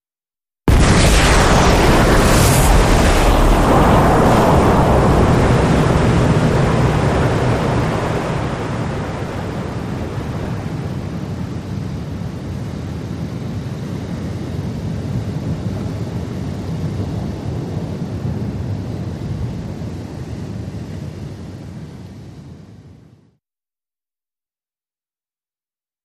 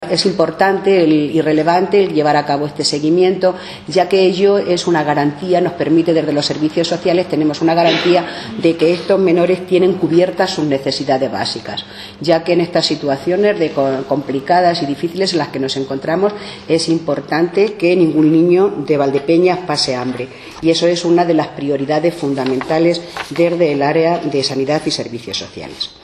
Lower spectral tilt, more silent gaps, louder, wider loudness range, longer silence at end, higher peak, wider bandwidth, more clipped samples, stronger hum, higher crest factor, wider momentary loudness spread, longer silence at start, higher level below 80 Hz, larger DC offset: about the same, -5.5 dB/octave vs -5.5 dB/octave; neither; about the same, -17 LUFS vs -15 LUFS; first, 16 LU vs 3 LU; first, 3.15 s vs 0.1 s; about the same, 0 dBFS vs 0 dBFS; first, 15.5 kHz vs 12 kHz; neither; neither; about the same, 16 dB vs 14 dB; first, 16 LU vs 8 LU; first, 0.65 s vs 0 s; first, -24 dBFS vs -54 dBFS; neither